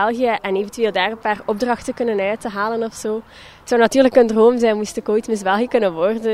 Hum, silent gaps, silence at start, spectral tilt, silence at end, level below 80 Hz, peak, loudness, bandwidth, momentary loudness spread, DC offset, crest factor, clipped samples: none; none; 0 s; -4.5 dB/octave; 0 s; -52 dBFS; 0 dBFS; -18 LUFS; 13.5 kHz; 9 LU; under 0.1%; 18 dB; under 0.1%